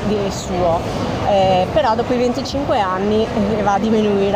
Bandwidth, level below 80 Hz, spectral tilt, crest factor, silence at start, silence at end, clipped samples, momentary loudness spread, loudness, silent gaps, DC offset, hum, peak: 15.5 kHz; -36 dBFS; -6 dB/octave; 14 dB; 0 s; 0 s; under 0.1%; 5 LU; -17 LUFS; none; under 0.1%; none; -4 dBFS